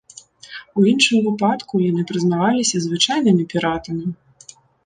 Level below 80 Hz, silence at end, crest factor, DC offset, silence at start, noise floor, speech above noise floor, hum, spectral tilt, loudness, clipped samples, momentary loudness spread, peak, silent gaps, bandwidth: -56 dBFS; 0.7 s; 18 dB; under 0.1%; 0.45 s; -46 dBFS; 29 dB; none; -4.5 dB/octave; -18 LUFS; under 0.1%; 12 LU; -2 dBFS; none; 9.8 kHz